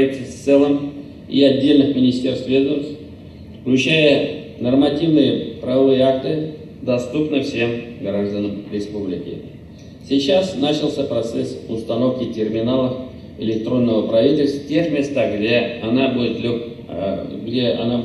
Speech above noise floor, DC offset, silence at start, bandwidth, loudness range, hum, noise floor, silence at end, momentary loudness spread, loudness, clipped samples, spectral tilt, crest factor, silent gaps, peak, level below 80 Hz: 20 dB; under 0.1%; 0 s; 11 kHz; 5 LU; none; -38 dBFS; 0 s; 14 LU; -19 LUFS; under 0.1%; -6.5 dB/octave; 16 dB; none; -2 dBFS; -52 dBFS